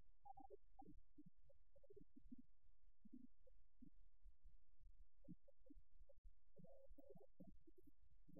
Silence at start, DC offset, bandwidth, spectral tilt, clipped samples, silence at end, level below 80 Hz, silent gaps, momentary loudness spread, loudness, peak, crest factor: 0 s; 0.1%; 1.2 kHz; -3 dB/octave; under 0.1%; 0 s; -72 dBFS; 6.18-6.24 s; 3 LU; -68 LUFS; -48 dBFS; 18 dB